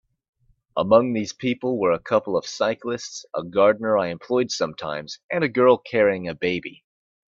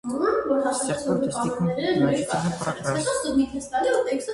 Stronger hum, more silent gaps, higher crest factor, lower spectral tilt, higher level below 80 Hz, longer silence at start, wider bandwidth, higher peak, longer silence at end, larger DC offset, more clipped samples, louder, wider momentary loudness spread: neither; first, 5.24-5.29 s vs none; about the same, 20 dB vs 16 dB; about the same, -5 dB/octave vs -5 dB/octave; second, -62 dBFS vs -54 dBFS; first, 0.75 s vs 0.05 s; second, 7.6 kHz vs 11.5 kHz; first, -2 dBFS vs -8 dBFS; first, 0.65 s vs 0 s; neither; neither; about the same, -22 LUFS vs -24 LUFS; first, 12 LU vs 4 LU